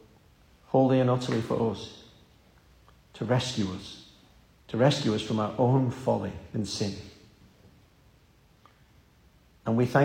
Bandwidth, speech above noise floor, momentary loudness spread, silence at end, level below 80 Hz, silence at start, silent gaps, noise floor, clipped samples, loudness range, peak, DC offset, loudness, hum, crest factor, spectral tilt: 10.5 kHz; 34 dB; 16 LU; 0 s; -60 dBFS; 0.7 s; none; -60 dBFS; under 0.1%; 8 LU; -10 dBFS; under 0.1%; -28 LUFS; none; 20 dB; -6.5 dB/octave